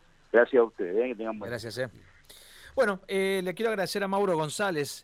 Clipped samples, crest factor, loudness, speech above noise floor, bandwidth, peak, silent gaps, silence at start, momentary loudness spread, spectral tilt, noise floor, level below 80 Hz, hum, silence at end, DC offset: under 0.1%; 20 dB; -28 LUFS; 24 dB; 16.5 kHz; -8 dBFS; none; 0.35 s; 12 LU; -4.5 dB/octave; -52 dBFS; -62 dBFS; none; 0.05 s; under 0.1%